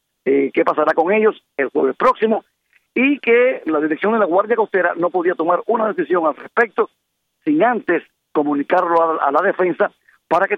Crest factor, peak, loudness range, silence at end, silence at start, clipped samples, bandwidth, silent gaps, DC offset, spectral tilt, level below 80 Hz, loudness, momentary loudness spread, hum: 16 dB; -2 dBFS; 2 LU; 0 s; 0.25 s; under 0.1%; 6.6 kHz; none; under 0.1%; -7.5 dB/octave; -66 dBFS; -17 LUFS; 6 LU; none